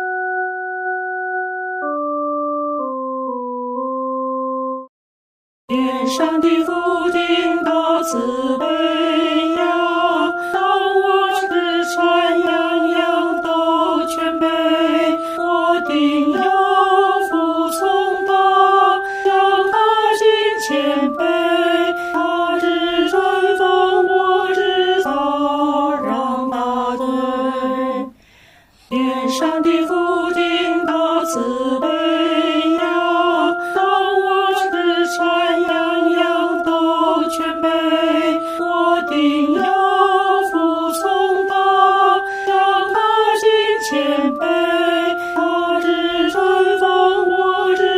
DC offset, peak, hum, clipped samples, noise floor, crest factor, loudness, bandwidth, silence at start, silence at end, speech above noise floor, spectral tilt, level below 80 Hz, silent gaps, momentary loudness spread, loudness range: under 0.1%; -2 dBFS; none; under 0.1%; -49 dBFS; 14 dB; -16 LUFS; 16 kHz; 0 s; 0 s; 32 dB; -3 dB/octave; -56 dBFS; 4.89-5.68 s; 7 LU; 6 LU